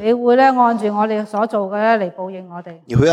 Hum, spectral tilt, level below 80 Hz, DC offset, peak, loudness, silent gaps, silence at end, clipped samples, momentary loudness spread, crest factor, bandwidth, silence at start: none; -7 dB/octave; -48 dBFS; under 0.1%; -2 dBFS; -16 LUFS; none; 0 s; under 0.1%; 18 LU; 14 dB; 11 kHz; 0 s